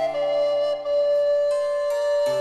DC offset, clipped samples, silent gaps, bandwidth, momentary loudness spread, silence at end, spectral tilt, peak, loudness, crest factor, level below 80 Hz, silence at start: under 0.1%; under 0.1%; none; 12.5 kHz; 3 LU; 0 s; -3 dB/octave; -14 dBFS; -22 LUFS; 8 dB; -62 dBFS; 0 s